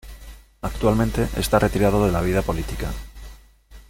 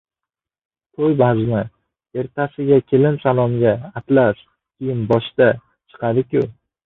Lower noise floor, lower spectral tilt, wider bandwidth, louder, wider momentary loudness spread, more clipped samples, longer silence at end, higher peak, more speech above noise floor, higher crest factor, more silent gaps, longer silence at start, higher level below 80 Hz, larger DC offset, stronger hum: second, -47 dBFS vs -86 dBFS; second, -6 dB/octave vs -10.5 dB/octave; first, 17 kHz vs 4.1 kHz; second, -22 LUFS vs -18 LUFS; about the same, 15 LU vs 13 LU; neither; second, 0.1 s vs 0.35 s; about the same, -2 dBFS vs -2 dBFS; second, 26 dB vs 70 dB; about the same, 20 dB vs 16 dB; neither; second, 0.05 s vs 1 s; first, -32 dBFS vs -52 dBFS; neither; neither